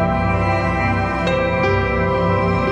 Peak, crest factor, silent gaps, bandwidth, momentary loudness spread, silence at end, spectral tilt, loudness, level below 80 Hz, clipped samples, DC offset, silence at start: -6 dBFS; 12 dB; none; 9 kHz; 1 LU; 0 s; -7.5 dB/octave; -18 LUFS; -30 dBFS; under 0.1%; under 0.1%; 0 s